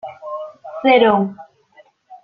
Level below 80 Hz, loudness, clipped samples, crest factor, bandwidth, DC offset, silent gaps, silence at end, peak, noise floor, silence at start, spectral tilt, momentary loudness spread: -62 dBFS; -15 LUFS; under 0.1%; 18 dB; 5 kHz; under 0.1%; none; 0.05 s; -2 dBFS; -52 dBFS; 0.05 s; -8 dB/octave; 18 LU